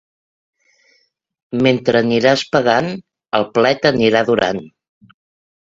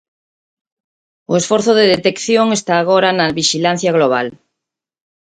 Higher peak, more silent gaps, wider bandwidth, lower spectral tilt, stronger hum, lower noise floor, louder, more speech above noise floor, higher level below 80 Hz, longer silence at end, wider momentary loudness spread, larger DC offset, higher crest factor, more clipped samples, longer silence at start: about the same, 0 dBFS vs 0 dBFS; neither; second, 7.8 kHz vs 9.6 kHz; first, -5.5 dB/octave vs -4 dB/octave; neither; second, -62 dBFS vs -82 dBFS; about the same, -15 LUFS vs -14 LUFS; second, 48 dB vs 68 dB; about the same, -54 dBFS vs -56 dBFS; first, 1.1 s vs 0.9 s; first, 11 LU vs 6 LU; neither; about the same, 18 dB vs 16 dB; neither; first, 1.5 s vs 1.3 s